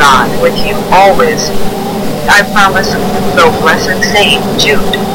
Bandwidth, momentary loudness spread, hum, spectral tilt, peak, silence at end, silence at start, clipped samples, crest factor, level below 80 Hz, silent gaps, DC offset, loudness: 18 kHz; 8 LU; none; -3.5 dB/octave; 0 dBFS; 0 s; 0 s; 2%; 8 dB; -26 dBFS; none; 7%; -8 LUFS